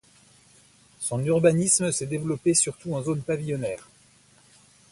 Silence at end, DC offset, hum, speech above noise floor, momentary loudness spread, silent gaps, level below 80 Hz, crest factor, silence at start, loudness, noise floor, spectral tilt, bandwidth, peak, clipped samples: 1.1 s; under 0.1%; none; 33 dB; 10 LU; none; -60 dBFS; 20 dB; 1 s; -24 LUFS; -58 dBFS; -4.5 dB/octave; 11.5 kHz; -6 dBFS; under 0.1%